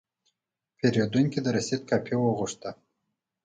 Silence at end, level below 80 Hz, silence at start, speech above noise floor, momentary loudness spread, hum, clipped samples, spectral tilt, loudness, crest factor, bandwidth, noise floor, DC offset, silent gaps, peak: 0.7 s; -64 dBFS; 0.85 s; 58 dB; 9 LU; none; under 0.1%; -6 dB/octave; -27 LUFS; 18 dB; 9.4 kHz; -84 dBFS; under 0.1%; none; -10 dBFS